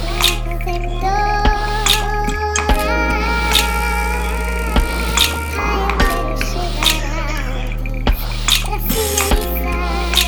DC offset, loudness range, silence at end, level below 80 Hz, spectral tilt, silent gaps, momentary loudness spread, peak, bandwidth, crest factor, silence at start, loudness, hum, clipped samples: under 0.1%; 2 LU; 0 s; -20 dBFS; -3 dB/octave; none; 7 LU; -2 dBFS; over 20 kHz; 16 dB; 0 s; -17 LUFS; none; under 0.1%